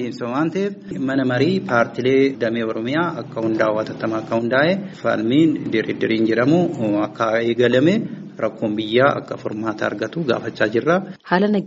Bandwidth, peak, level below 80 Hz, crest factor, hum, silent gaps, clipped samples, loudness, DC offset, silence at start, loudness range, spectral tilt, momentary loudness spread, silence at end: 7.8 kHz; -2 dBFS; -60 dBFS; 18 dB; none; none; under 0.1%; -20 LUFS; under 0.1%; 0 s; 2 LU; -5 dB/octave; 8 LU; 0 s